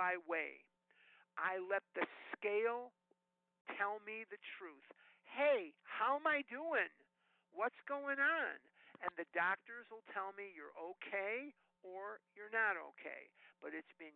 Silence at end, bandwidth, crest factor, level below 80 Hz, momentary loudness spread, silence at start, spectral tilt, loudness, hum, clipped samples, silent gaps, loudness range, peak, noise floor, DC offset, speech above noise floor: 0.05 s; 4.3 kHz; 18 dB; under -90 dBFS; 17 LU; 0 s; 0 dB/octave; -41 LUFS; none; under 0.1%; 3.61-3.65 s; 4 LU; -24 dBFS; -82 dBFS; under 0.1%; 40 dB